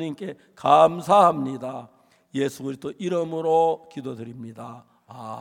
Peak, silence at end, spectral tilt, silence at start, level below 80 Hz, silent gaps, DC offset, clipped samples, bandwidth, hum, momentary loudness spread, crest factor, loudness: -4 dBFS; 0 s; -6 dB/octave; 0 s; -70 dBFS; none; under 0.1%; under 0.1%; 16.5 kHz; none; 21 LU; 20 dB; -22 LUFS